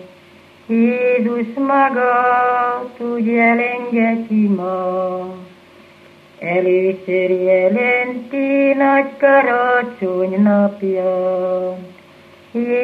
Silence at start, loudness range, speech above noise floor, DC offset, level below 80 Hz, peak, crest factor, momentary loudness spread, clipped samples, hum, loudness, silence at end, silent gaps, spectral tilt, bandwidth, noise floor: 0 s; 4 LU; 29 dB; under 0.1%; -70 dBFS; -2 dBFS; 14 dB; 9 LU; under 0.1%; 50 Hz at -60 dBFS; -16 LUFS; 0 s; none; -8.5 dB/octave; 5.2 kHz; -45 dBFS